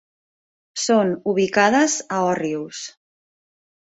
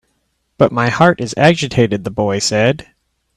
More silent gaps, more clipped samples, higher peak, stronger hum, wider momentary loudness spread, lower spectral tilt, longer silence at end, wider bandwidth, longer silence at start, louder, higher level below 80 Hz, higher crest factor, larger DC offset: neither; neither; second, -4 dBFS vs 0 dBFS; neither; first, 16 LU vs 5 LU; second, -3.5 dB/octave vs -5 dB/octave; first, 1.05 s vs 0.55 s; second, 8.4 kHz vs 12.5 kHz; first, 0.75 s vs 0.6 s; second, -20 LUFS vs -14 LUFS; second, -66 dBFS vs -46 dBFS; about the same, 18 dB vs 16 dB; neither